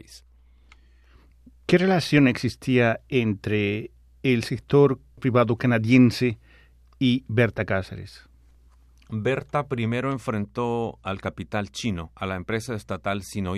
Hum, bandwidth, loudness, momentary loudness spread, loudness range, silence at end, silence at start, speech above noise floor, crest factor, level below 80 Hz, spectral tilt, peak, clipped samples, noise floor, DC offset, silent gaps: none; 13.5 kHz; -24 LUFS; 12 LU; 7 LU; 0 s; 0.1 s; 31 dB; 18 dB; -52 dBFS; -6.5 dB/octave; -6 dBFS; under 0.1%; -54 dBFS; under 0.1%; none